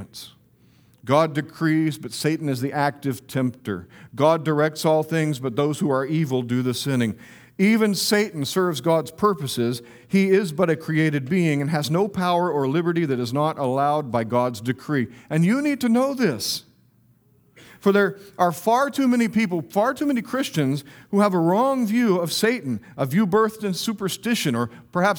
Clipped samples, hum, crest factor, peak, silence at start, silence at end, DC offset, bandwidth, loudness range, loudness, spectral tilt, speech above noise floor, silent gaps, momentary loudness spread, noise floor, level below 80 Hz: under 0.1%; none; 18 dB; -4 dBFS; 0 s; 0 s; under 0.1%; over 20 kHz; 2 LU; -22 LUFS; -5.5 dB/octave; 37 dB; none; 7 LU; -58 dBFS; -64 dBFS